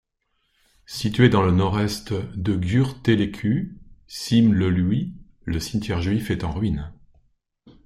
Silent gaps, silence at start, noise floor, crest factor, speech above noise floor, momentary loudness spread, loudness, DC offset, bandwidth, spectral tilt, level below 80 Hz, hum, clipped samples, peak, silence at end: none; 0.9 s; -72 dBFS; 20 dB; 51 dB; 15 LU; -22 LUFS; under 0.1%; 15 kHz; -6.5 dB/octave; -44 dBFS; none; under 0.1%; -4 dBFS; 0.15 s